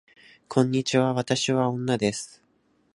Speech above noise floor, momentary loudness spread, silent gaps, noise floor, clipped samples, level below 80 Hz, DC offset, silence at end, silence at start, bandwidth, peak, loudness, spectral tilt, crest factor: 42 dB; 5 LU; none; -66 dBFS; under 0.1%; -64 dBFS; under 0.1%; 0.7 s; 0.5 s; 11.5 kHz; -4 dBFS; -25 LUFS; -5 dB/octave; 20 dB